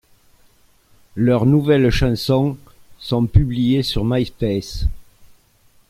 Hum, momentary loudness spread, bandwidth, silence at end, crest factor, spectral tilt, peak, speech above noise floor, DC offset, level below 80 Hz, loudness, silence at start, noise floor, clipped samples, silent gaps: none; 12 LU; 15 kHz; 0.65 s; 18 dB; -7 dB/octave; -2 dBFS; 38 dB; under 0.1%; -30 dBFS; -18 LUFS; 1.15 s; -54 dBFS; under 0.1%; none